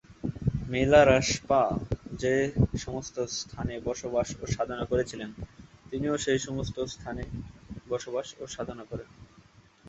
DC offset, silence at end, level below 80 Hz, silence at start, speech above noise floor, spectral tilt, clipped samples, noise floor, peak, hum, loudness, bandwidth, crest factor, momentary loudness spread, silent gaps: under 0.1%; 0 s; -46 dBFS; 0.1 s; 29 dB; -5 dB/octave; under 0.1%; -57 dBFS; -6 dBFS; none; -29 LUFS; 8.2 kHz; 24 dB; 17 LU; none